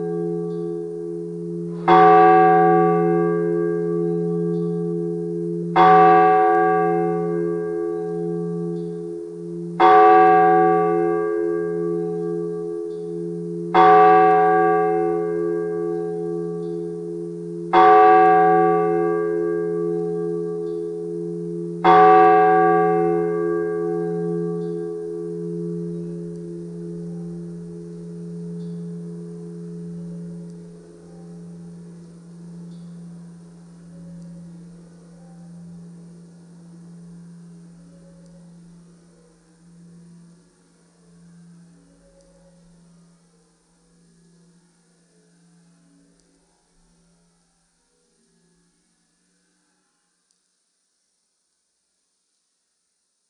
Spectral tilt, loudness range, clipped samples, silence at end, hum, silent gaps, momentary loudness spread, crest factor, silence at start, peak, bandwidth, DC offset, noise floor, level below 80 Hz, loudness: -8 dB/octave; 21 LU; under 0.1%; 15.6 s; none; none; 24 LU; 20 dB; 0 s; -2 dBFS; 9.6 kHz; under 0.1%; -73 dBFS; -62 dBFS; -18 LUFS